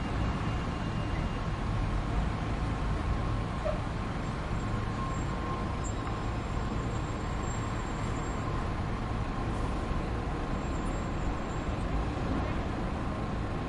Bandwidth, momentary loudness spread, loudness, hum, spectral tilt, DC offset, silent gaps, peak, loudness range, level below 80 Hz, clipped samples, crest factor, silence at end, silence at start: 11 kHz; 2 LU; -34 LUFS; none; -6.5 dB/octave; under 0.1%; none; -18 dBFS; 1 LU; -36 dBFS; under 0.1%; 14 dB; 0 s; 0 s